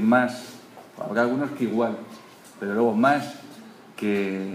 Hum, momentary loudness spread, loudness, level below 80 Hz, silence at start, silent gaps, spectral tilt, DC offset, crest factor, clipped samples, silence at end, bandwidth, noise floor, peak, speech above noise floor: none; 24 LU; -24 LUFS; -74 dBFS; 0 s; none; -6.5 dB/octave; under 0.1%; 18 dB; under 0.1%; 0 s; 15.5 kHz; -44 dBFS; -6 dBFS; 20 dB